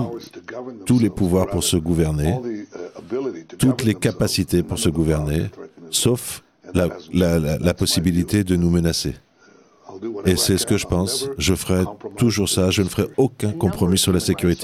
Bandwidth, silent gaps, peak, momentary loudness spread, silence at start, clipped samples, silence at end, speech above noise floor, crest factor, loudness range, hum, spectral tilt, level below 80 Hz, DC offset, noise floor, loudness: 16 kHz; none; -4 dBFS; 13 LU; 0 s; under 0.1%; 0 s; 33 dB; 18 dB; 2 LU; none; -5 dB/octave; -40 dBFS; under 0.1%; -52 dBFS; -20 LUFS